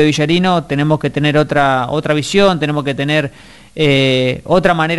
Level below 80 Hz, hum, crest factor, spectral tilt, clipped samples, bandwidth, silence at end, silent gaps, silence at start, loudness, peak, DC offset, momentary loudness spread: -42 dBFS; none; 14 dB; -5.5 dB/octave; under 0.1%; 11.5 kHz; 0 s; none; 0 s; -14 LUFS; 0 dBFS; under 0.1%; 5 LU